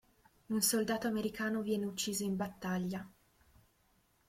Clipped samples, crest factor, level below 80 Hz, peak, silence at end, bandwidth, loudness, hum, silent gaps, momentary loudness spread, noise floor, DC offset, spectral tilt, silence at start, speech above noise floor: under 0.1%; 20 dB; -68 dBFS; -16 dBFS; 1.2 s; 16.5 kHz; -36 LUFS; none; none; 9 LU; -73 dBFS; under 0.1%; -4 dB/octave; 0.5 s; 37 dB